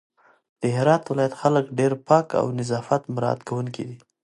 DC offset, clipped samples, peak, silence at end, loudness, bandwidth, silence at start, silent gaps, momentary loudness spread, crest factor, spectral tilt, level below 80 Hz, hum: under 0.1%; under 0.1%; -2 dBFS; 0.3 s; -23 LUFS; 11.5 kHz; 0.6 s; none; 10 LU; 22 dB; -7 dB/octave; -64 dBFS; none